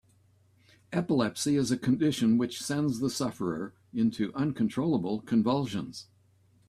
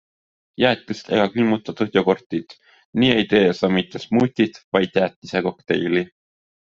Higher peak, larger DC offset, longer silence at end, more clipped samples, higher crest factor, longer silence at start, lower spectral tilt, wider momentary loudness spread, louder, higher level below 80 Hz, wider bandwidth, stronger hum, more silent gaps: second, -14 dBFS vs 0 dBFS; neither; about the same, 0.65 s vs 0.65 s; neither; about the same, 16 dB vs 20 dB; first, 0.9 s vs 0.6 s; about the same, -5.5 dB/octave vs -6.5 dB/octave; about the same, 8 LU vs 8 LU; second, -29 LUFS vs -20 LUFS; second, -64 dBFS vs -58 dBFS; first, 14 kHz vs 7.6 kHz; neither; second, none vs 2.26-2.30 s, 2.85-2.93 s, 4.64-4.72 s, 5.16-5.22 s